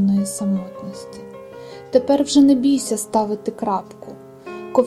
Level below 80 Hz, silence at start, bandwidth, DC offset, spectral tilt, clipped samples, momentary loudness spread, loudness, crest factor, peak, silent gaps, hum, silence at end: -58 dBFS; 0 s; 13 kHz; under 0.1%; -5.5 dB/octave; under 0.1%; 23 LU; -19 LUFS; 18 dB; -2 dBFS; none; none; 0 s